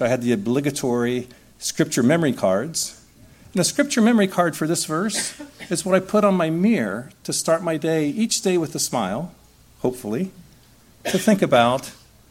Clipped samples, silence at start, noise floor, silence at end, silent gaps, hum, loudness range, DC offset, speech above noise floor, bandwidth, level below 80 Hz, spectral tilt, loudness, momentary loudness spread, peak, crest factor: under 0.1%; 0 s; -52 dBFS; 0.35 s; none; none; 4 LU; under 0.1%; 31 dB; 16.5 kHz; -58 dBFS; -4.5 dB/octave; -21 LUFS; 11 LU; -2 dBFS; 20 dB